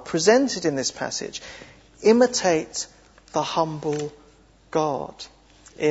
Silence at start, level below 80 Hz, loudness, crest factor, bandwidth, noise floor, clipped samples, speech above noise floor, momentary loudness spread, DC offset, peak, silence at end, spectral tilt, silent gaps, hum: 0 s; -58 dBFS; -23 LUFS; 20 dB; 8 kHz; -54 dBFS; under 0.1%; 32 dB; 18 LU; under 0.1%; -4 dBFS; 0 s; -3.5 dB/octave; none; none